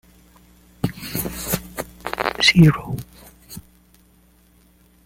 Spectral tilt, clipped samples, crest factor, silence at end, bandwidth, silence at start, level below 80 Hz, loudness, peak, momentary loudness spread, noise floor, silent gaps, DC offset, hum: -4.5 dB/octave; under 0.1%; 22 dB; 1.45 s; 17 kHz; 0.85 s; -44 dBFS; -20 LUFS; 0 dBFS; 26 LU; -55 dBFS; none; under 0.1%; none